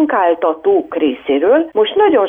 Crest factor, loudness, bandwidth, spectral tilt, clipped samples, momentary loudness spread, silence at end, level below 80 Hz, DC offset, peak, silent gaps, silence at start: 10 dB; -14 LUFS; 3.7 kHz; -7.5 dB/octave; under 0.1%; 4 LU; 0 s; -56 dBFS; under 0.1%; -2 dBFS; none; 0 s